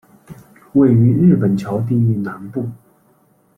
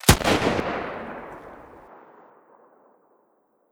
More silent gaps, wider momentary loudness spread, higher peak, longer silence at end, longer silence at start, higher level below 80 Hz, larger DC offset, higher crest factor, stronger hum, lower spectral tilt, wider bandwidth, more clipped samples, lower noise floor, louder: neither; second, 14 LU vs 27 LU; about the same, -2 dBFS vs 0 dBFS; second, 0.8 s vs 1.9 s; first, 0.3 s vs 0.05 s; second, -52 dBFS vs -40 dBFS; neither; second, 14 dB vs 26 dB; neither; first, -10.5 dB/octave vs -4 dB/octave; second, 6 kHz vs over 20 kHz; neither; second, -56 dBFS vs -66 dBFS; first, -16 LUFS vs -24 LUFS